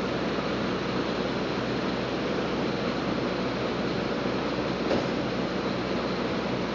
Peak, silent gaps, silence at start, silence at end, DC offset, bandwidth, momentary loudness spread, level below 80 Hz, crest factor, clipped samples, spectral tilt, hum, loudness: -14 dBFS; none; 0 s; 0 s; under 0.1%; 7.6 kHz; 2 LU; -48 dBFS; 14 dB; under 0.1%; -6 dB/octave; none; -29 LUFS